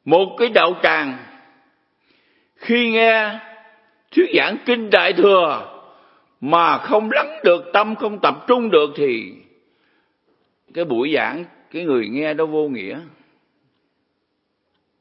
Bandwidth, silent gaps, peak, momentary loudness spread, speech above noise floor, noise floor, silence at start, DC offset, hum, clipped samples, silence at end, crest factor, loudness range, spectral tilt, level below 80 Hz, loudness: 5.8 kHz; none; 0 dBFS; 17 LU; 54 dB; -71 dBFS; 0.05 s; under 0.1%; none; under 0.1%; 1.9 s; 20 dB; 7 LU; -7.5 dB/octave; -74 dBFS; -17 LUFS